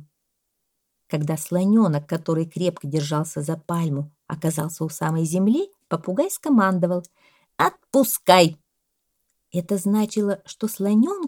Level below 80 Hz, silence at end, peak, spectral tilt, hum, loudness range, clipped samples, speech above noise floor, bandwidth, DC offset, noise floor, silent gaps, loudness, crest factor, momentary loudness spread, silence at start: -68 dBFS; 0 s; 0 dBFS; -5.5 dB/octave; none; 4 LU; under 0.1%; 55 dB; 18.5 kHz; under 0.1%; -76 dBFS; none; -22 LUFS; 22 dB; 10 LU; 1.1 s